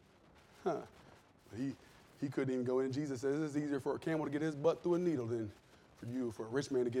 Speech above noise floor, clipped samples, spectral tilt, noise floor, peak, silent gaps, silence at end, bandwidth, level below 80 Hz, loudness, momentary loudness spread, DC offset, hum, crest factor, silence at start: 27 dB; under 0.1%; -7 dB/octave; -64 dBFS; -20 dBFS; none; 0 s; 13.5 kHz; -74 dBFS; -38 LUFS; 10 LU; under 0.1%; none; 18 dB; 0.6 s